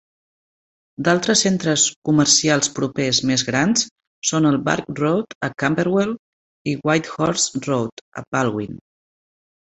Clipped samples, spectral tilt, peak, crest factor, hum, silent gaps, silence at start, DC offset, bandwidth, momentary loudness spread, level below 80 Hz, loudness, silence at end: under 0.1%; -3.5 dB/octave; -2 dBFS; 20 dB; none; 1.96-2.02 s, 3.91-3.96 s, 4.07-4.22 s, 5.35-5.41 s, 6.19-6.65 s, 7.92-8.12 s, 8.27-8.32 s; 1 s; under 0.1%; 8.4 kHz; 11 LU; -56 dBFS; -19 LUFS; 0.95 s